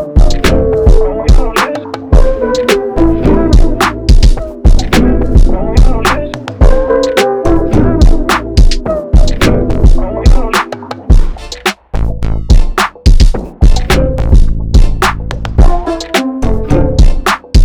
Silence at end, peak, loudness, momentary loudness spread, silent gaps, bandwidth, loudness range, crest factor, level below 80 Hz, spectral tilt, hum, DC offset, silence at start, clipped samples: 0 s; 0 dBFS; -11 LUFS; 6 LU; none; 14.5 kHz; 2 LU; 8 dB; -10 dBFS; -6 dB/octave; none; under 0.1%; 0 s; 10%